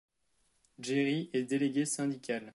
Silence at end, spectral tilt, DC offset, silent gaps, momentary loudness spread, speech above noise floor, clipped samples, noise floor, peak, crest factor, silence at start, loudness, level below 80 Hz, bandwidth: 0.05 s; -4.5 dB/octave; under 0.1%; none; 5 LU; 43 dB; under 0.1%; -76 dBFS; -20 dBFS; 14 dB; 0.8 s; -33 LUFS; -80 dBFS; 11.5 kHz